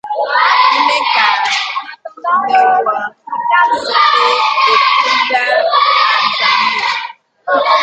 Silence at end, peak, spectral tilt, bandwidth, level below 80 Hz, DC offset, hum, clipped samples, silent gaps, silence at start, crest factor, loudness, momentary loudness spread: 0 s; 0 dBFS; -0.5 dB/octave; 9.2 kHz; -64 dBFS; under 0.1%; none; under 0.1%; none; 0.05 s; 12 dB; -11 LUFS; 11 LU